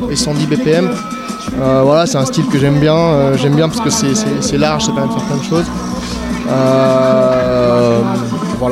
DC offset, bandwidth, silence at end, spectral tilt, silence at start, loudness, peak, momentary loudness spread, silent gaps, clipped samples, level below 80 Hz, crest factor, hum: under 0.1%; 15.5 kHz; 0 s; -5.5 dB/octave; 0 s; -13 LUFS; -2 dBFS; 9 LU; none; under 0.1%; -36 dBFS; 12 dB; none